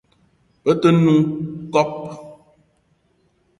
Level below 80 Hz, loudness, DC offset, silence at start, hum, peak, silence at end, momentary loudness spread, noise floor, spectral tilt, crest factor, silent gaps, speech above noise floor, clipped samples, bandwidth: -58 dBFS; -18 LUFS; under 0.1%; 0.65 s; none; -2 dBFS; 1.25 s; 18 LU; -63 dBFS; -7.5 dB/octave; 20 dB; none; 46 dB; under 0.1%; 11 kHz